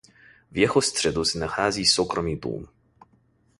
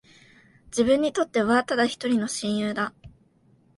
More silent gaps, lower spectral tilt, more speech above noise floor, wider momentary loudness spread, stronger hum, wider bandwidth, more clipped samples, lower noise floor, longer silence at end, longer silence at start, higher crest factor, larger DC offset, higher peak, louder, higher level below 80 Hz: neither; about the same, -3 dB/octave vs -4 dB/octave; about the same, 39 dB vs 37 dB; first, 13 LU vs 8 LU; neither; about the same, 11.5 kHz vs 11.5 kHz; neither; about the same, -63 dBFS vs -61 dBFS; first, 0.95 s vs 0.7 s; second, 0.5 s vs 0.7 s; about the same, 22 dB vs 18 dB; neither; first, -4 dBFS vs -8 dBFS; about the same, -23 LUFS vs -24 LUFS; first, -48 dBFS vs -60 dBFS